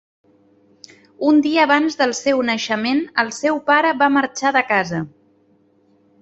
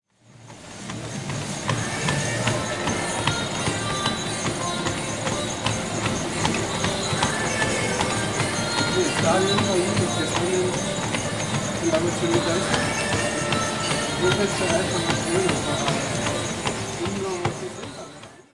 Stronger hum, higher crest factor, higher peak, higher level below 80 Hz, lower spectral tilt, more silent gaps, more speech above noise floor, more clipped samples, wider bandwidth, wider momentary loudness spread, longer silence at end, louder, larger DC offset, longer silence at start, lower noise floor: neither; about the same, 18 dB vs 20 dB; about the same, -2 dBFS vs -4 dBFS; second, -64 dBFS vs -48 dBFS; about the same, -4 dB/octave vs -3.5 dB/octave; neither; first, 40 dB vs 26 dB; neither; second, 8.2 kHz vs 12 kHz; about the same, 6 LU vs 6 LU; first, 1.15 s vs 0.15 s; first, -17 LUFS vs -23 LUFS; second, under 0.1% vs 0.2%; first, 1.2 s vs 0.3 s; first, -57 dBFS vs -47 dBFS